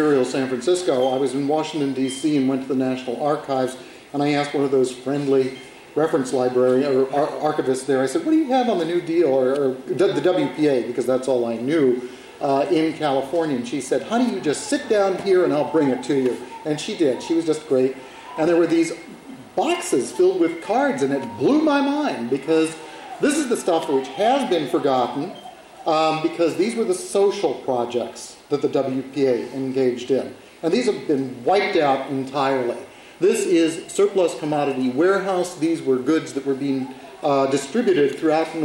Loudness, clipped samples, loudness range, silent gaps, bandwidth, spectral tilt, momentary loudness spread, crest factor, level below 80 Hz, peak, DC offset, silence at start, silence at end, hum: -21 LUFS; under 0.1%; 2 LU; none; 16 kHz; -5 dB/octave; 7 LU; 12 dB; -64 dBFS; -8 dBFS; under 0.1%; 0 s; 0 s; none